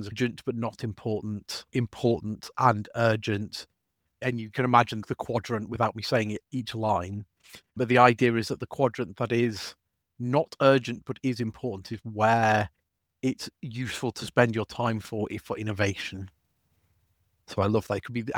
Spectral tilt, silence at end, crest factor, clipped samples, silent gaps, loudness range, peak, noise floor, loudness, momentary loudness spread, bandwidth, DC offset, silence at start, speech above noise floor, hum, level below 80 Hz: -6 dB/octave; 0 s; 24 dB; under 0.1%; none; 4 LU; -2 dBFS; -72 dBFS; -27 LUFS; 14 LU; 17 kHz; under 0.1%; 0 s; 45 dB; none; -60 dBFS